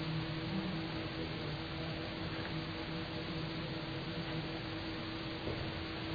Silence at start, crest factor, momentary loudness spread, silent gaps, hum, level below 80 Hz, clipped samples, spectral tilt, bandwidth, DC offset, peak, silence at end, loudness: 0 s; 14 dB; 2 LU; none; none; -54 dBFS; under 0.1%; -4 dB/octave; 5 kHz; under 0.1%; -26 dBFS; 0 s; -40 LUFS